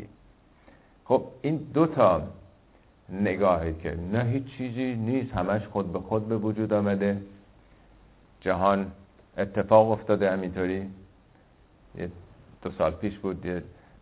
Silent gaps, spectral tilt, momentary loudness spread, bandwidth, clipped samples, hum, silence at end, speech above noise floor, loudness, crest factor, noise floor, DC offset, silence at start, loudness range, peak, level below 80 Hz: none; -11.5 dB/octave; 17 LU; 4 kHz; under 0.1%; none; 0.3 s; 32 dB; -27 LUFS; 22 dB; -58 dBFS; under 0.1%; 0 s; 5 LU; -6 dBFS; -48 dBFS